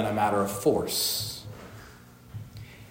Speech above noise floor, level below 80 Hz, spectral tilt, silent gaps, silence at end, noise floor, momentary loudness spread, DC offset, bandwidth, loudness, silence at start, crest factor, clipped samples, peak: 24 dB; -56 dBFS; -3.5 dB/octave; none; 0 s; -50 dBFS; 20 LU; under 0.1%; 16.5 kHz; -26 LUFS; 0 s; 18 dB; under 0.1%; -12 dBFS